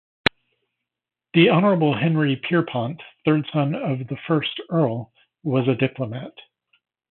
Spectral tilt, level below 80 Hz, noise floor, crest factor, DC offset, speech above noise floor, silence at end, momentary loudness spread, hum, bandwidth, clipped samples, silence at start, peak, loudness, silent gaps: -8.5 dB/octave; -60 dBFS; -87 dBFS; 22 dB; under 0.1%; 66 dB; 0.8 s; 13 LU; none; 4.6 kHz; under 0.1%; 1.35 s; 0 dBFS; -22 LUFS; none